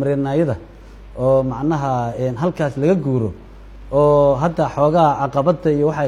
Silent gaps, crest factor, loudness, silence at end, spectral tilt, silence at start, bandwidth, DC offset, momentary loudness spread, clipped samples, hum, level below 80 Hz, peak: none; 16 dB; -18 LUFS; 0 s; -8.5 dB/octave; 0 s; 10.5 kHz; under 0.1%; 8 LU; under 0.1%; none; -40 dBFS; -2 dBFS